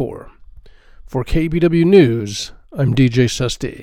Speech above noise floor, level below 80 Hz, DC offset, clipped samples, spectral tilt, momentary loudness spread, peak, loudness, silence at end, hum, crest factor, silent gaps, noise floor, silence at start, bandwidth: 26 dB; -32 dBFS; under 0.1%; under 0.1%; -6.5 dB/octave; 15 LU; 0 dBFS; -16 LUFS; 0 s; none; 16 dB; none; -41 dBFS; 0 s; 14 kHz